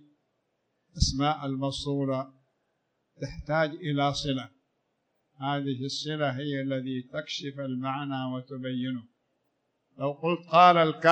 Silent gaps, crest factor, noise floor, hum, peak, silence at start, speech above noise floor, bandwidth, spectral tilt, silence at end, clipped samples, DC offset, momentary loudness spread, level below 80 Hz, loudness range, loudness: none; 22 dB; -77 dBFS; none; -6 dBFS; 0.95 s; 49 dB; 9.6 kHz; -5.5 dB/octave; 0 s; under 0.1%; under 0.1%; 13 LU; -46 dBFS; 7 LU; -28 LUFS